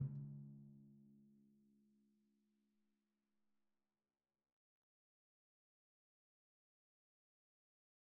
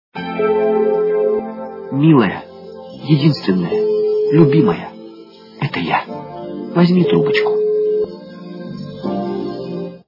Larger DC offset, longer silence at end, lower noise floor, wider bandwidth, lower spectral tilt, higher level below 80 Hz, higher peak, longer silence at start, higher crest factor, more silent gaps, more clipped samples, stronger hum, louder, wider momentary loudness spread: neither; first, 6.4 s vs 0.1 s; first, under -90 dBFS vs -39 dBFS; second, 1.3 kHz vs 5.8 kHz; first, -16 dB/octave vs -9 dB/octave; second, -90 dBFS vs -58 dBFS; second, -34 dBFS vs 0 dBFS; second, 0 s vs 0.15 s; first, 26 dB vs 16 dB; neither; neither; neither; second, -55 LUFS vs -16 LUFS; about the same, 18 LU vs 18 LU